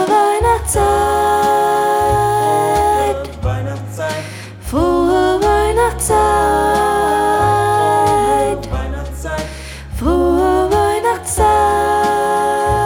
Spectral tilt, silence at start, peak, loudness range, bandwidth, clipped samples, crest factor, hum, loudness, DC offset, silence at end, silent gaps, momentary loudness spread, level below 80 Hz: -5 dB/octave; 0 s; -2 dBFS; 3 LU; 17.5 kHz; under 0.1%; 12 dB; none; -15 LUFS; under 0.1%; 0 s; none; 10 LU; -28 dBFS